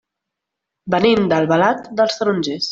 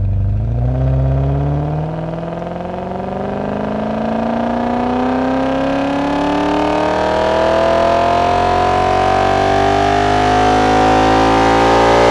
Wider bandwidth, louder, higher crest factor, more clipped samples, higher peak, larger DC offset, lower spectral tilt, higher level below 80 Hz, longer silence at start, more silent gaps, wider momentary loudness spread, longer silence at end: second, 7.8 kHz vs 12 kHz; about the same, -17 LUFS vs -15 LUFS; about the same, 16 dB vs 14 dB; neither; about the same, -2 dBFS vs 0 dBFS; neither; about the same, -5.5 dB/octave vs -6.5 dB/octave; second, -56 dBFS vs -28 dBFS; first, 0.85 s vs 0 s; neither; second, 6 LU vs 10 LU; about the same, 0 s vs 0 s